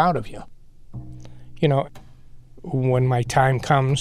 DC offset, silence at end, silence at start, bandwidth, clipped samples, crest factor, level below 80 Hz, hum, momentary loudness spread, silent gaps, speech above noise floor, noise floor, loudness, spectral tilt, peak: under 0.1%; 0 s; 0 s; 12 kHz; under 0.1%; 18 dB; -44 dBFS; none; 22 LU; none; 22 dB; -42 dBFS; -21 LUFS; -6.5 dB/octave; -6 dBFS